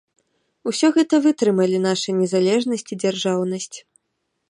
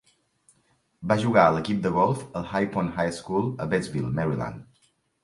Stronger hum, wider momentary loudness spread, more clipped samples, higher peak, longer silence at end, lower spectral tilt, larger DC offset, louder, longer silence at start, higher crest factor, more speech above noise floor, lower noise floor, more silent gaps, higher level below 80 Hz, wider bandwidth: neither; about the same, 11 LU vs 11 LU; neither; about the same, -6 dBFS vs -4 dBFS; about the same, 0.7 s vs 0.6 s; second, -5 dB/octave vs -7 dB/octave; neither; first, -20 LUFS vs -25 LUFS; second, 0.65 s vs 1 s; second, 14 dB vs 22 dB; first, 56 dB vs 43 dB; first, -75 dBFS vs -68 dBFS; neither; second, -72 dBFS vs -54 dBFS; about the same, 11.5 kHz vs 11.5 kHz